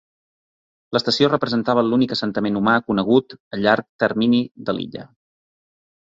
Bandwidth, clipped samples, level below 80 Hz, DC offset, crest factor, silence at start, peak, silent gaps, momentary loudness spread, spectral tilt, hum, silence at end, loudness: 7.8 kHz; under 0.1%; -58 dBFS; under 0.1%; 18 dB; 0.9 s; -2 dBFS; 3.40-3.51 s, 3.89-3.99 s, 4.51-4.55 s; 9 LU; -6 dB/octave; none; 1.1 s; -19 LUFS